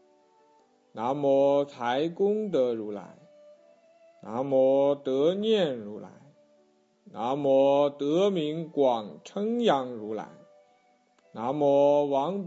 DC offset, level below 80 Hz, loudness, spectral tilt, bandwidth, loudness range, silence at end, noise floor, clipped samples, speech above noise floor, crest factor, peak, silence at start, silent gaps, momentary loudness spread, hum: under 0.1%; -78 dBFS; -26 LUFS; -6.5 dB/octave; 7.8 kHz; 3 LU; 0 s; -65 dBFS; under 0.1%; 39 dB; 18 dB; -10 dBFS; 0.95 s; none; 16 LU; none